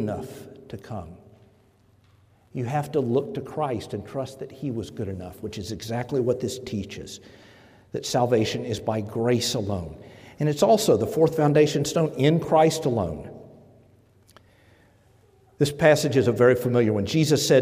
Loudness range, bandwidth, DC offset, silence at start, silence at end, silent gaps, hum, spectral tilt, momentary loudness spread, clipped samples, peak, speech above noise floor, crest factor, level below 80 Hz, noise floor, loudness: 9 LU; 16 kHz; under 0.1%; 0 s; 0 s; none; none; -5.5 dB/octave; 18 LU; under 0.1%; -6 dBFS; 36 dB; 20 dB; -58 dBFS; -59 dBFS; -24 LUFS